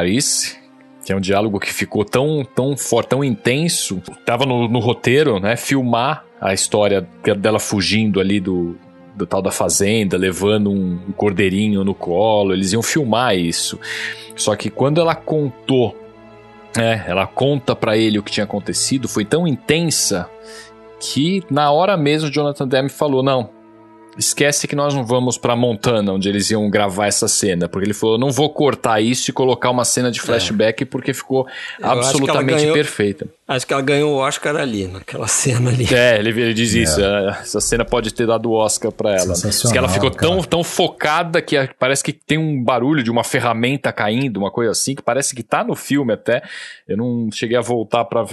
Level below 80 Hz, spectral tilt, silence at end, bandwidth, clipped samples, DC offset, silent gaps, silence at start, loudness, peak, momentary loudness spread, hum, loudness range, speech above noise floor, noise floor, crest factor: -46 dBFS; -4 dB/octave; 0 s; 12.5 kHz; under 0.1%; under 0.1%; none; 0 s; -17 LUFS; 0 dBFS; 6 LU; none; 3 LU; 26 dB; -44 dBFS; 18 dB